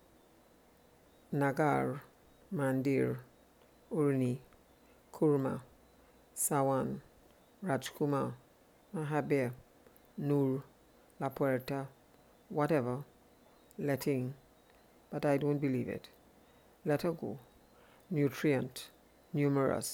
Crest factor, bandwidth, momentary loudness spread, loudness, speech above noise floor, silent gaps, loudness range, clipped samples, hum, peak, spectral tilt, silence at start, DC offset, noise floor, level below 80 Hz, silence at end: 20 dB; over 20 kHz; 14 LU; -35 LUFS; 31 dB; none; 3 LU; under 0.1%; none; -16 dBFS; -6.5 dB/octave; 1.3 s; under 0.1%; -64 dBFS; -70 dBFS; 0 s